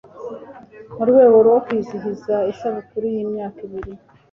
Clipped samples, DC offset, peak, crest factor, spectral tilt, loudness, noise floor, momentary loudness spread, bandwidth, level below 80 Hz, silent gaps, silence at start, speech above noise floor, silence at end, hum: under 0.1%; under 0.1%; -2 dBFS; 16 dB; -8.5 dB/octave; -18 LUFS; -40 dBFS; 22 LU; 6.2 kHz; -52 dBFS; none; 0.15 s; 23 dB; 0.35 s; none